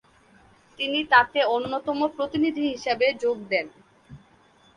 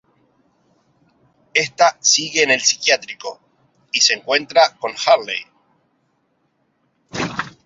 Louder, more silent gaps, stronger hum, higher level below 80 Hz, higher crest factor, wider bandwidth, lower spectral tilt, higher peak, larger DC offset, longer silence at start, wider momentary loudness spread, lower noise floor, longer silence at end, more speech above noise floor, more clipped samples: second, -24 LUFS vs -16 LUFS; neither; neither; about the same, -62 dBFS vs -62 dBFS; about the same, 22 dB vs 20 dB; first, 11 kHz vs 7.8 kHz; first, -4.5 dB/octave vs -0.5 dB/octave; second, -4 dBFS vs 0 dBFS; neither; second, 0.8 s vs 1.55 s; second, 9 LU vs 13 LU; second, -58 dBFS vs -66 dBFS; first, 0.6 s vs 0.15 s; second, 34 dB vs 49 dB; neither